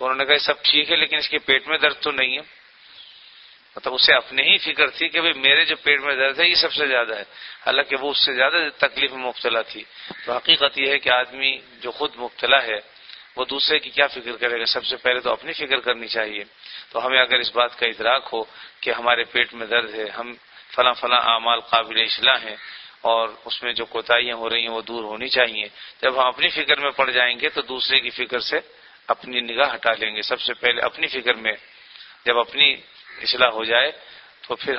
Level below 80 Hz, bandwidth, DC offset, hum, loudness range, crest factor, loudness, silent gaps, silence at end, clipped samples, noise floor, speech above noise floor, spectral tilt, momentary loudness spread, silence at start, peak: -60 dBFS; 6 kHz; under 0.1%; none; 4 LU; 20 dB; -19 LUFS; none; 0 s; under 0.1%; -48 dBFS; 27 dB; -4.5 dB/octave; 13 LU; 0 s; 0 dBFS